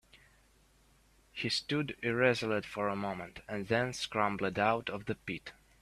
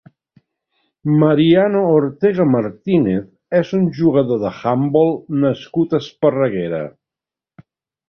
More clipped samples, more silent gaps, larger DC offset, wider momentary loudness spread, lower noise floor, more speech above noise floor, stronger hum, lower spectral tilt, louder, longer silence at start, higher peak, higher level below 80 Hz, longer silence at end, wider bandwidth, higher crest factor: neither; neither; neither; first, 12 LU vs 7 LU; second, -66 dBFS vs -88 dBFS; second, 32 dB vs 73 dB; neither; second, -5 dB/octave vs -9 dB/octave; second, -34 LUFS vs -16 LUFS; second, 0.15 s vs 1.05 s; second, -12 dBFS vs -2 dBFS; second, -64 dBFS vs -54 dBFS; second, 0.3 s vs 1.2 s; first, 14 kHz vs 6.4 kHz; first, 22 dB vs 16 dB